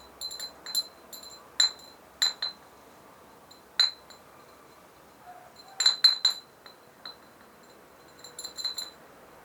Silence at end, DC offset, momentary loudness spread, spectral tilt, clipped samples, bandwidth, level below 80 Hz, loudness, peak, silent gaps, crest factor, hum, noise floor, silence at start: 0.55 s; under 0.1%; 28 LU; 2 dB/octave; under 0.1%; over 20 kHz; -74 dBFS; -26 LUFS; -8 dBFS; none; 26 dB; none; -54 dBFS; 0.2 s